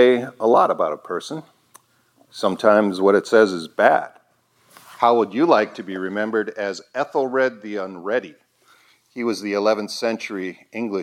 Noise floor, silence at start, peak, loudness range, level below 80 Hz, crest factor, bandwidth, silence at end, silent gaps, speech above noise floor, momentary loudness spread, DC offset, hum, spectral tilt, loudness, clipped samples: -61 dBFS; 0 s; 0 dBFS; 6 LU; -78 dBFS; 20 dB; 15 kHz; 0 s; none; 41 dB; 13 LU; under 0.1%; none; -5 dB/octave; -20 LUFS; under 0.1%